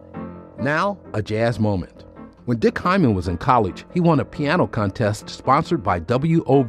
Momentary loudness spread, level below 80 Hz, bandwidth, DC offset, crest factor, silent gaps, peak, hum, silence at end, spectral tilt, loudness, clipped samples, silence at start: 9 LU; -48 dBFS; 12 kHz; under 0.1%; 18 dB; none; -4 dBFS; none; 0 s; -7.5 dB/octave; -21 LUFS; under 0.1%; 0.15 s